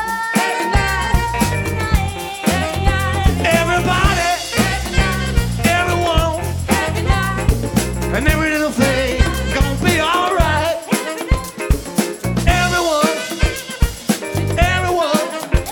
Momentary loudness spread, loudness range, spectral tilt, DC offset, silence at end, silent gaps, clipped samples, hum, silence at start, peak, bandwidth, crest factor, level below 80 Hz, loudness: 5 LU; 2 LU; -4.5 dB/octave; under 0.1%; 0 s; none; under 0.1%; none; 0 s; 0 dBFS; over 20 kHz; 16 dB; -22 dBFS; -17 LUFS